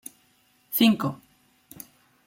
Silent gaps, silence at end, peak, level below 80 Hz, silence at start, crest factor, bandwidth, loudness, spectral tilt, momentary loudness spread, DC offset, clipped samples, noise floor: none; 1.1 s; -8 dBFS; -70 dBFS; 0.7 s; 20 dB; 16.5 kHz; -23 LUFS; -4.5 dB/octave; 24 LU; under 0.1%; under 0.1%; -64 dBFS